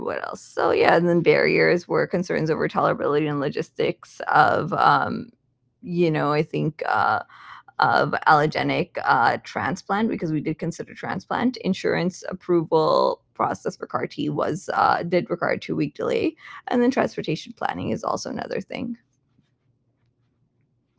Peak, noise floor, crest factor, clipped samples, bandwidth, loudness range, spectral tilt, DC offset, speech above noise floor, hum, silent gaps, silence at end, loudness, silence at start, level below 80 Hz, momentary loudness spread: 0 dBFS; -68 dBFS; 22 dB; under 0.1%; 8 kHz; 5 LU; -6 dB/octave; under 0.1%; 46 dB; none; none; 2.05 s; -23 LUFS; 0 s; -60 dBFS; 12 LU